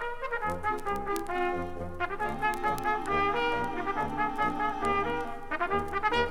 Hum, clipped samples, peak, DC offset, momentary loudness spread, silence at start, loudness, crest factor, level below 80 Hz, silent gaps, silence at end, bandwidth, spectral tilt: none; under 0.1%; -12 dBFS; under 0.1%; 6 LU; 0 s; -31 LUFS; 18 dB; -44 dBFS; none; 0 s; 19 kHz; -5 dB/octave